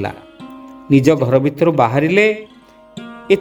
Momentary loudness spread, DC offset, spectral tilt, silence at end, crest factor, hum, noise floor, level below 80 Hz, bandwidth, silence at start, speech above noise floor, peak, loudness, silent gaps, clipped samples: 22 LU; under 0.1%; -7 dB/octave; 0 s; 16 dB; none; -37 dBFS; -52 dBFS; 19 kHz; 0 s; 24 dB; 0 dBFS; -14 LUFS; none; under 0.1%